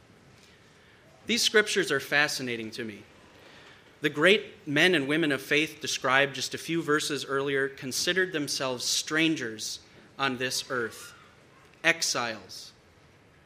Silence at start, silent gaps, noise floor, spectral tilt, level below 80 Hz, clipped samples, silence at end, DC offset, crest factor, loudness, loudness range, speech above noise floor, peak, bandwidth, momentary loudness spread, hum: 1.25 s; none; -58 dBFS; -2.5 dB/octave; -70 dBFS; under 0.1%; 0.75 s; under 0.1%; 24 dB; -27 LUFS; 5 LU; 30 dB; -6 dBFS; 15.5 kHz; 15 LU; none